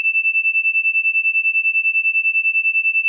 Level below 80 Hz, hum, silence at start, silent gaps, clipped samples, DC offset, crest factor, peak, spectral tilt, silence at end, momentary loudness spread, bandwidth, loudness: under -90 dBFS; none; 0 s; none; under 0.1%; under 0.1%; 6 dB; -12 dBFS; 6 dB/octave; 0 s; 0 LU; 2.9 kHz; -14 LUFS